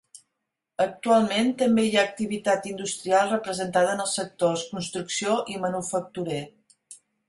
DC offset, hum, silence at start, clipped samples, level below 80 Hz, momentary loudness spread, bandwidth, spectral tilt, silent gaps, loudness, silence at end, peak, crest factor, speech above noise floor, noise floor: under 0.1%; none; 0.15 s; under 0.1%; -66 dBFS; 10 LU; 11.5 kHz; -4 dB/octave; none; -25 LUFS; 0.35 s; -8 dBFS; 18 dB; 57 dB; -82 dBFS